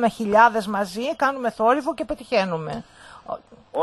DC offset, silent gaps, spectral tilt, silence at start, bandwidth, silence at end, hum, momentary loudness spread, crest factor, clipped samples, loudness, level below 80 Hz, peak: under 0.1%; none; -5 dB/octave; 0 s; 12.5 kHz; 0 s; none; 19 LU; 20 dB; under 0.1%; -21 LUFS; -54 dBFS; -2 dBFS